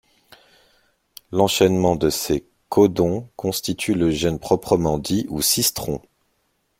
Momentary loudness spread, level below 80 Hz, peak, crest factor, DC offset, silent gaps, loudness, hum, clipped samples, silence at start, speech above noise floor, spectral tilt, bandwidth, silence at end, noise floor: 9 LU; -46 dBFS; -2 dBFS; 20 dB; under 0.1%; none; -20 LUFS; none; under 0.1%; 1.3 s; 49 dB; -4.5 dB/octave; 16.5 kHz; 0.8 s; -69 dBFS